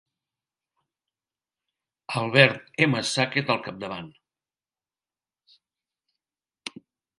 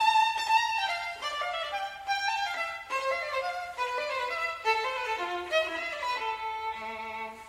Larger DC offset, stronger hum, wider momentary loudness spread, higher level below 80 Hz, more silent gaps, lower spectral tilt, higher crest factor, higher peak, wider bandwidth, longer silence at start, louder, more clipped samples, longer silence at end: neither; neither; first, 21 LU vs 9 LU; about the same, -70 dBFS vs -66 dBFS; neither; first, -4.5 dB/octave vs -0.5 dB/octave; first, 28 dB vs 18 dB; first, 0 dBFS vs -14 dBFS; second, 11.5 kHz vs 16 kHz; first, 2.1 s vs 0 s; first, -23 LUFS vs -30 LUFS; neither; first, 0.5 s vs 0 s